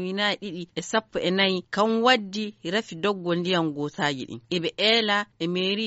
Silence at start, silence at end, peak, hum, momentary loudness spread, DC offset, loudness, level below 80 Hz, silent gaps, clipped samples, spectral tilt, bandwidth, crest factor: 0 s; 0 s; -6 dBFS; none; 10 LU; under 0.1%; -25 LUFS; -66 dBFS; none; under 0.1%; -2.5 dB/octave; 8 kHz; 20 dB